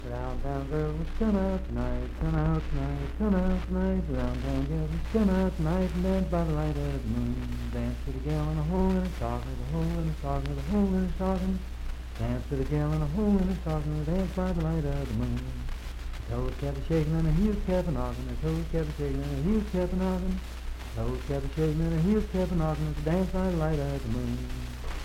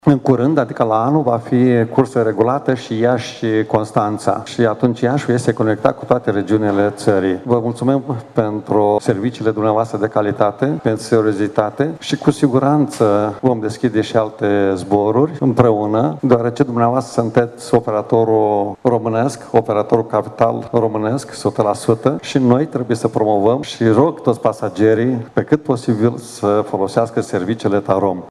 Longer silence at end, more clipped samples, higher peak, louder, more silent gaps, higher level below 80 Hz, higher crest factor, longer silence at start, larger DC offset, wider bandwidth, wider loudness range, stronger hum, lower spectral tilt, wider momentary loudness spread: about the same, 0 s vs 0 s; neither; second, -14 dBFS vs 0 dBFS; second, -30 LUFS vs -16 LUFS; neither; first, -34 dBFS vs -52 dBFS; about the same, 16 dB vs 16 dB; about the same, 0 s vs 0.05 s; neither; first, 15.5 kHz vs 12.5 kHz; about the same, 2 LU vs 2 LU; neither; about the same, -8 dB/octave vs -7 dB/octave; first, 8 LU vs 5 LU